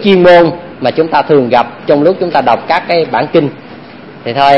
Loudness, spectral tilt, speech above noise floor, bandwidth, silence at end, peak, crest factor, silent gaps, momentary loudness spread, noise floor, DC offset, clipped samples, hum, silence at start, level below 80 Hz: -10 LUFS; -7.5 dB/octave; 22 dB; 7 kHz; 0 s; 0 dBFS; 10 dB; none; 11 LU; -31 dBFS; under 0.1%; 0.7%; none; 0 s; -46 dBFS